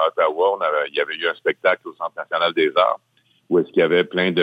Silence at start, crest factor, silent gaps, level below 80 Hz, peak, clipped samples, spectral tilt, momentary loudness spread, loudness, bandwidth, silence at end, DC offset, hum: 0 s; 16 dB; none; -66 dBFS; -4 dBFS; under 0.1%; -7 dB/octave; 7 LU; -20 LUFS; 5 kHz; 0 s; under 0.1%; none